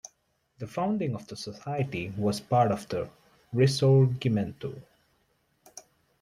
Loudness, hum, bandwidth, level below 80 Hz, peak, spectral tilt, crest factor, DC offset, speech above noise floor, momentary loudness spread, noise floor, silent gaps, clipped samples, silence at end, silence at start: -28 LUFS; none; 12.5 kHz; -62 dBFS; -10 dBFS; -7 dB/octave; 18 dB; under 0.1%; 45 dB; 26 LU; -71 dBFS; none; under 0.1%; 0.4 s; 0.6 s